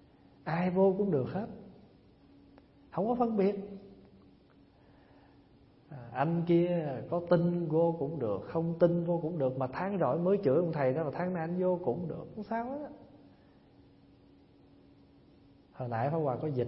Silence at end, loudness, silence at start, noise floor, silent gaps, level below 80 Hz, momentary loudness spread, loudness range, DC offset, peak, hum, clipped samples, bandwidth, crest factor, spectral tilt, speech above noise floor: 0 s; -32 LUFS; 0.45 s; -61 dBFS; none; -68 dBFS; 14 LU; 10 LU; under 0.1%; -12 dBFS; none; under 0.1%; 5.8 kHz; 20 dB; -12 dB/octave; 31 dB